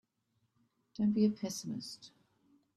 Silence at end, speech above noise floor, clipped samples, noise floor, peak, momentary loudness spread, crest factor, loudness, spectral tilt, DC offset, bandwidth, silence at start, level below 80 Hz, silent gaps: 0.7 s; 46 dB; under 0.1%; -80 dBFS; -18 dBFS; 20 LU; 20 dB; -35 LUFS; -6 dB/octave; under 0.1%; 13 kHz; 1 s; -78 dBFS; none